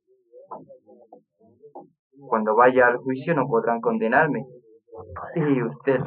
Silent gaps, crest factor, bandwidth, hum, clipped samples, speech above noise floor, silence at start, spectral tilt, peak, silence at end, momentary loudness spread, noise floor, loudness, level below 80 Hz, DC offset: 1.99-2.11 s; 20 dB; 4.3 kHz; none; under 0.1%; 34 dB; 0.35 s; -11 dB/octave; -4 dBFS; 0 s; 25 LU; -55 dBFS; -21 LUFS; -68 dBFS; under 0.1%